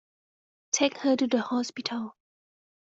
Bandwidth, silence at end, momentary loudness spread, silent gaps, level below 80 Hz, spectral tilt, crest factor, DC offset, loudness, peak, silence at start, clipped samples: 8 kHz; 0.85 s; 10 LU; none; -76 dBFS; -2.5 dB/octave; 20 dB; under 0.1%; -28 LUFS; -10 dBFS; 0.75 s; under 0.1%